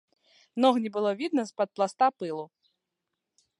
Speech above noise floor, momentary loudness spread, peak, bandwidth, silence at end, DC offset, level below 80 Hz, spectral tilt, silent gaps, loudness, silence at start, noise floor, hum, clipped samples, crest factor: 58 dB; 14 LU; -8 dBFS; 11 kHz; 1.15 s; under 0.1%; -84 dBFS; -5 dB/octave; none; -27 LUFS; 0.55 s; -85 dBFS; none; under 0.1%; 20 dB